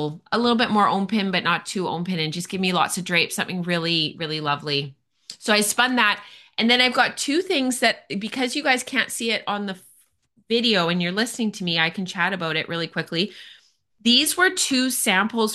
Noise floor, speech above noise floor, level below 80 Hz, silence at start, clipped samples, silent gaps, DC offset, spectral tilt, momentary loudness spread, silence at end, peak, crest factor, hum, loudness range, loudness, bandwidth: -62 dBFS; 40 dB; -66 dBFS; 0 s; under 0.1%; none; under 0.1%; -3 dB/octave; 9 LU; 0 s; -4 dBFS; 20 dB; none; 3 LU; -21 LUFS; 12.5 kHz